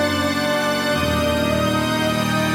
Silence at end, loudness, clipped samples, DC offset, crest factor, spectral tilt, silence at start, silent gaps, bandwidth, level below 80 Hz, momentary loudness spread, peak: 0 s; -19 LUFS; under 0.1%; under 0.1%; 14 dB; -4.5 dB/octave; 0 s; none; 17.5 kHz; -38 dBFS; 1 LU; -6 dBFS